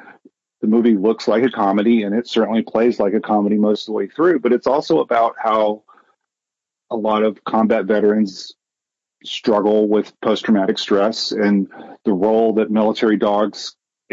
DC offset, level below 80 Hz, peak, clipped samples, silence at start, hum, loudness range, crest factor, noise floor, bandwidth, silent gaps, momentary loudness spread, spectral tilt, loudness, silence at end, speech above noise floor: under 0.1%; -64 dBFS; -6 dBFS; under 0.1%; 0.6 s; none; 3 LU; 12 dB; -86 dBFS; 7.8 kHz; none; 8 LU; -6 dB/octave; -17 LUFS; 0.4 s; 69 dB